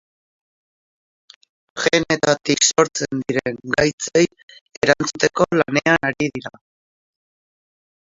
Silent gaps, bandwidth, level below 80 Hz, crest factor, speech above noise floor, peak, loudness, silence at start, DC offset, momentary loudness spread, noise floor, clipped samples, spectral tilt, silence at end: 3.93-3.98 s, 4.43-4.48 s, 4.61-4.66 s, 4.77-4.81 s; 7.8 kHz; -54 dBFS; 22 dB; over 71 dB; 0 dBFS; -18 LUFS; 1.75 s; under 0.1%; 9 LU; under -90 dBFS; under 0.1%; -3.5 dB/octave; 1.5 s